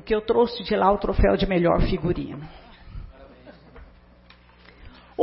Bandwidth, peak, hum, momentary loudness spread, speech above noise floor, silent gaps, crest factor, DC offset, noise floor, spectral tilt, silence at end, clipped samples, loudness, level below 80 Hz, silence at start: 5.8 kHz; -6 dBFS; 60 Hz at -50 dBFS; 22 LU; 30 dB; none; 18 dB; under 0.1%; -52 dBFS; -11 dB/octave; 0 s; under 0.1%; -22 LUFS; -34 dBFS; 0.05 s